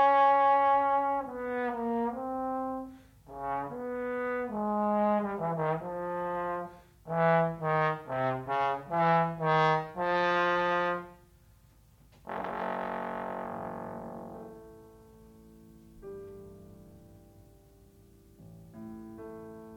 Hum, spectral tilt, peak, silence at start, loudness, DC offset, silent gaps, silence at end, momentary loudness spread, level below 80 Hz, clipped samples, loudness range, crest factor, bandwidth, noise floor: none; -7.5 dB/octave; -14 dBFS; 0 s; -30 LUFS; under 0.1%; none; 0 s; 20 LU; -62 dBFS; under 0.1%; 22 LU; 18 dB; 15.5 kHz; -60 dBFS